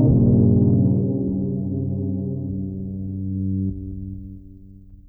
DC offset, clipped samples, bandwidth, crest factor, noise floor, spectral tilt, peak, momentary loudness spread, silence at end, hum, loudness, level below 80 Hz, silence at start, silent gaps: under 0.1%; under 0.1%; 1.3 kHz; 14 dB; -43 dBFS; -16.5 dB/octave; -6 dBFS; 17 LU; 0.1 s; none; -21 LUFS; -38 dBFS; 0 s; none